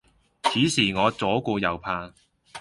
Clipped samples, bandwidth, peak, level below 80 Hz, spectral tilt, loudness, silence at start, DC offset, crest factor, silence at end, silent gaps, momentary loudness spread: under 0.1%; 11.5 kHz; -6 dBFS; -54 dBFS; -4 dB/octave; -24 LUFS; 0.45 s; under 0.1%; 20 dB; 0 s; none; 11 LU